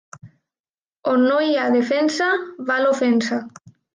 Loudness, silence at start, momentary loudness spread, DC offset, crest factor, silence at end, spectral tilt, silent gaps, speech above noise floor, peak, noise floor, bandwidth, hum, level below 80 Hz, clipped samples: -19 LUFS; 0.25 s; 9 LU; under 0.1%; 12 dB; 0.5 s; -4 dB/octave; 0.60-0.73 s, 0.86-0.91 s; over 71 dB; -8 dBFS; under -90 dBFS; 9.6 kHz; none; -72 dBFS; under 0.1%